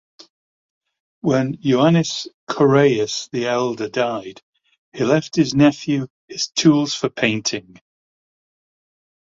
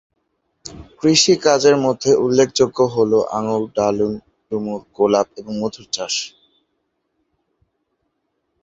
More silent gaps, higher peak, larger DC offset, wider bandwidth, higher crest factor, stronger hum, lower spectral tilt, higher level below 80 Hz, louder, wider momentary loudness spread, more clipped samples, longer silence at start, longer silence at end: first, 2.34-2.47 s, 4.43-4.53 s, 4.78-4.92 s, 6.10-6.28 s vs none; about the same, -2 dBFS vs 0 dBFS; neither; about the same, 7.6 kHz vs 8 kHz; about the same, 18 dB vs 18 dB; neither; about the same, -5 dB/octave vs -4 dB/octave; about the same, -58 dBFS vs -54 dBFS; about the same, -19 LUFS vs -17 LUFS; second, 10 LU vs 15 LU; neither; first, 1.25 s vs 0.65 s; second, 1.75 s vs 2.35 s